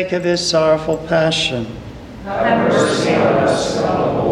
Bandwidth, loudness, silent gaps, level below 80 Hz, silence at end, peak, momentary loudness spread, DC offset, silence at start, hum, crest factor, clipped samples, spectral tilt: 12.5 kHz; -16 LUFS; none; -42 dBFS; 0 s; -4 dBFS; 12 LU; under 0.1%; 0 s; none; 14 dB; under 0.1%; -4.5 dB/octave